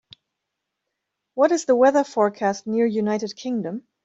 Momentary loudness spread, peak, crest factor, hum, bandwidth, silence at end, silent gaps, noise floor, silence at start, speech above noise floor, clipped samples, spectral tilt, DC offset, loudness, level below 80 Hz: 11 LU; -6 dBFS; 18 dB; none; 8 kHz; 0.25 s; none; -81 dBFS; 1.35 s; 61 dB; under 0.1%; -5 dB/octave; under 0.1%; -21 LUFS; -70 dBFS